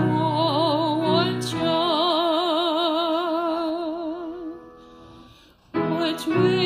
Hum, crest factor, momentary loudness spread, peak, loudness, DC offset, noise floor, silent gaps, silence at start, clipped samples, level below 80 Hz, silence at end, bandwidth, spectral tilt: none; 16 dB; 11 LU; -8 dBFS; -23 LUFS; under 0.1%; -52 dBFS; none; 0 s; under 0.1%; -60 dBFS; 0 s; 15 kHz; -6 dB/octave